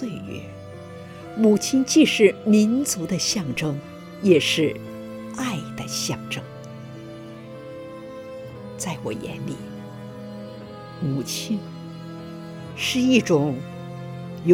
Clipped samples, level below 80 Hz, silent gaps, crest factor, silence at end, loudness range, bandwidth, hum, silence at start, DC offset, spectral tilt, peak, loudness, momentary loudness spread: under 0.1%; -60 dBFS; none; 20 dB; 0 s; 14 LU; 17.5 kHz; none; 0 s; under 0.1%; -4.5 dB/octave; -4 dBFS; -22 LUFS; 20 LU